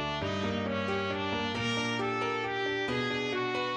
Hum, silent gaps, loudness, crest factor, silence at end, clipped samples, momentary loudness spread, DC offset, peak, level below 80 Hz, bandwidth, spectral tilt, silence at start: none; none; -31 LUFS; 14 dB; 0 s; under 0.1%; 2 LU; under 0.1%; -18 dBFS; -58 dBFS; 9.8 kHz; -5 dB/octave; 0 s